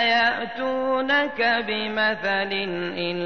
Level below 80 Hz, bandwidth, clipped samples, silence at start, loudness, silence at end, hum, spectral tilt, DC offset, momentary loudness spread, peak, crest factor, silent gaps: -60 dBFS; 6.6 kHz; under 0.1%; 0 s; -23 LUFS; 0 s; none; -5 dB/octave; 0.4%; 7 LU; -10 dBFS; 14 dB; none